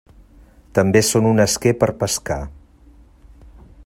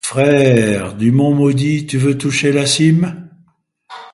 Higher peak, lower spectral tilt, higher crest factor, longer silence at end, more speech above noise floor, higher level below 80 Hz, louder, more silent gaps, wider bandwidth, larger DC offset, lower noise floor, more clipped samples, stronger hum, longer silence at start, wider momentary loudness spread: about the same, -2 dBFS vs 0 dBFS; about the same, -4.5 dB/octave vs -5.5 dB/octave; about the same, 18 dB vs 14 dB; first, 1.3 s vs 0.05 s; second, 31 dB vs 42 dB; first, -42 dBFS vs -48 dBFS; second, -18 LUFS vs -14 LUFS; neither; first, 16 kHz vs 11.5 kHz; neither; second, -48 dBFS vs -55 dBFS; neither; neither; first, 0.75 s vs 0.05 s; first, 12 LU vs 5 LU